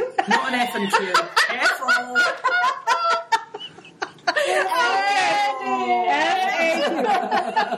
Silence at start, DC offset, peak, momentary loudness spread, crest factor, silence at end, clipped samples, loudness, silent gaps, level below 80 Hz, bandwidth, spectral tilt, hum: 0 s; under 0.1%; -4 dBFS; 6 LU; 18 dB; 0 s; under 0.1%; -20 LUFS; none; -74 dBFS; 15 kHz; -2 dB/octave; none